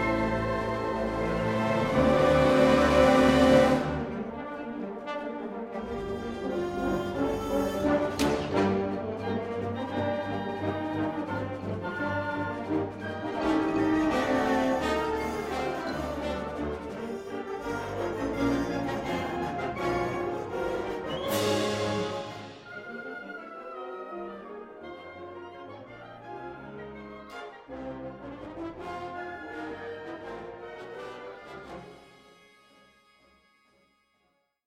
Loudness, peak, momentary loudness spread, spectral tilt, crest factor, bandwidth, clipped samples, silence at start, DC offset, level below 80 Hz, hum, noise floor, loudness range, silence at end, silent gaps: -29 LUFS; -8 dBFS; 20 LU; -6 dB/octave; 20 dB; 16 kHz; under 0.1%; 0 s; under 0.1%; -48 dBFS; none; -73 dBFS; 19 LU; 2.5 s; none